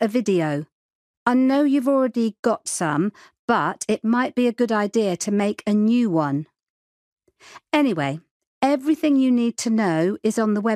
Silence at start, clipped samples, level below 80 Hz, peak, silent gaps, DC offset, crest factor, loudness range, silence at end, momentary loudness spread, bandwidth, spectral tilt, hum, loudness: 0 s; under 0.1%; -70 dBFS; -4 dBFS; 0.72-1.26 s, 2.39-2.43 s, 3.39-3.48 s, 6.70-7.17 s, 8.31-8.40 s, 8.47-8.61 s; under 0.1%; 16 dB; 2 LU; 0 s; 8 LU; 14.5 kHz; -5.5 dB/octave; none; -21 LUFS